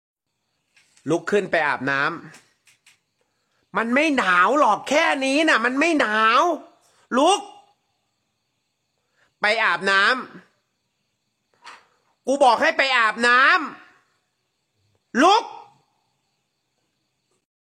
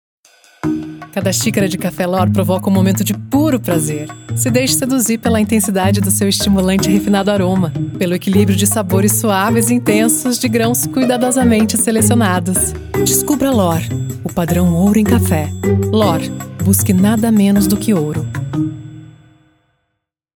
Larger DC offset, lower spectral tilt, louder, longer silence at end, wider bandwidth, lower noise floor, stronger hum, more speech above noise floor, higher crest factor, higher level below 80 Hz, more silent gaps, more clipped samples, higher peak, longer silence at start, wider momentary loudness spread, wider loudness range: neither; second, -3 dB/octave vs -5 dB/octave; second, -19 LUFS vs -14 LUFS; first, 2 s vs 1.3 s; second, 14 kHz vs 19.5 kHz; about the same, -75 dBFS vs -73 dBFS; neither; about the same, 56 dB vs 59 dB; about the same, 18 dB vs 14 dB; second, -70 dBFS vs -40 dBFS; neither; neither; second, -4 dBFS vs 0 dBFS; first, 1.05 s vs 0.65 s; about the same, 10 LU vs 8 LU; first, 7 LU vs 2 LU